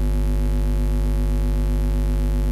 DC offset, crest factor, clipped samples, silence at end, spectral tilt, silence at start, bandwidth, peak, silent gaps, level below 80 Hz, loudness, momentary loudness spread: under 0.1%; 8 dB; under 0.1%; 0 s; -7.5 dB/octave; 0 s; 13 kHz; -12 dBFS; none; -20 dBFS; -23 LUFS; 0 LU